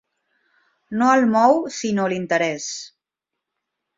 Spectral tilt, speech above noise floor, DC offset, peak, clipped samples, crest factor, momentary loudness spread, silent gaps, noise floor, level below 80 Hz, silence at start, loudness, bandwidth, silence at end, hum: -4.5 dB/octave; 65 dB; under 0.1%; -2 dBFS; under 0.1%; 20 dB; 14 LU; none; -84 dBFS; -66 dBFS; 0.9 s; -19 LUFS; 7.8 kHz; 1.1 s; none